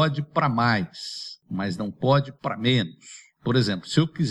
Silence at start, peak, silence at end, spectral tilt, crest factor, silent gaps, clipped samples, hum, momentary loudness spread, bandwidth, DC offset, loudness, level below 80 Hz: 0 s; -6 dBFS; 0 s; -6 dB/octave; 18 dB; none; under 0.1%; none; 11 LU; 11.5 kHz; under 0.1%; -25 LUFS; -60 dBFS